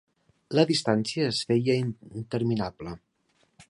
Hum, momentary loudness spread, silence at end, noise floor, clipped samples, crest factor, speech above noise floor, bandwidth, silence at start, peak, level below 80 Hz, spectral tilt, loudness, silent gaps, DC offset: none; 16 LU; 0.05 s; -69 dBFS; under 0.1%; 20 dB; 43 dB; 11.5 kHz; 0.5 s; -8 dBFS; -60 dBFS; -5.5 dB/octave; -26 LUFS; none; under 0.1%